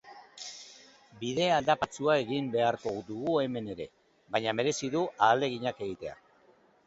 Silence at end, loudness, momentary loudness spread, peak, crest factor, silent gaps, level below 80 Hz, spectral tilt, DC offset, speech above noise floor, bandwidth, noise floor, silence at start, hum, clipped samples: 0.75 s; -30 LUFS; 17 LU; -10 dBFS; 22 dB; none; -66 dBFS; -4.5 dB/octave; under 0.1%; 34 dB; 8.2 kHz; -63 dBFS; 0.05 s; none; under 0.1%